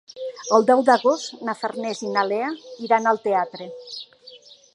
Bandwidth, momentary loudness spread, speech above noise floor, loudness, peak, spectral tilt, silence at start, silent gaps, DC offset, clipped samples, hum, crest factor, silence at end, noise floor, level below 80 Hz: 11 kHz; 19 LU; 26 dB; -21 LUFS; -2 dBFS; -3.5 dB/octave; 0.15 s; none; under 0.1%; under 0.1%; none; 20 dB; 0.35 s; -47 dBFS; -80 dBFS